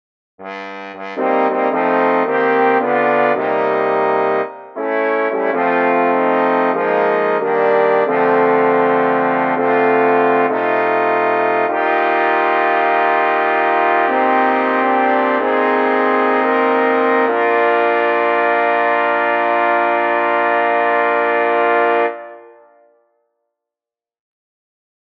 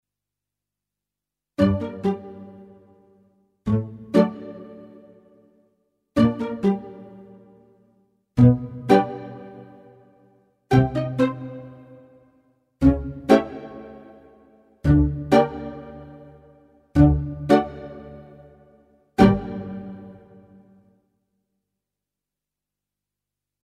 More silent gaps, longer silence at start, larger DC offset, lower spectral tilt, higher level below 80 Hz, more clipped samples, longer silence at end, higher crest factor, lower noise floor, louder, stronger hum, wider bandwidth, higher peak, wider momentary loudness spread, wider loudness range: neither; second, 0.4 s vs 1.6 s; neither; second, -7 dB/octave vs -8.5 dB/octave; second, -76 dBFS vs -38 dBFS; neither; second, 2.65 s vs 3.5 s; second, 14 dB vs 24 dB; about the same, -89 dBFS vs -88 dBFS; first, -15 LUFS vs -21 LUFS; second, none vs 50 Hz at -50 dBFS; second, 5.8 kHz vs 12 kHz; about the same, 0 dBFS vs 0 dBFS; second, 3 LU vs 24 LU; second, 2 LU vs 6 LU